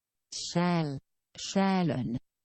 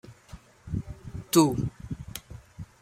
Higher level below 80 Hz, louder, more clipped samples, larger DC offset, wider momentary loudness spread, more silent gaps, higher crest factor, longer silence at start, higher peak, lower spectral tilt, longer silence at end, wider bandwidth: second, -62 dBFS vs -48 dBFS; second, -30 LUFS vs -27 LUFS; neither; neither; second, 14 LU vs 25 LU; neither; second, 16 dB vs 24 dB; first, 0.3 s vs 0.05 s; second, -16 dBFS vs -6 dBFS; about the same, -5.5 dB/octave vs -5.5 dB/octave; about the same, 0.25 s vs 0.15 s; second, 8.8 kHz vs 16 kHz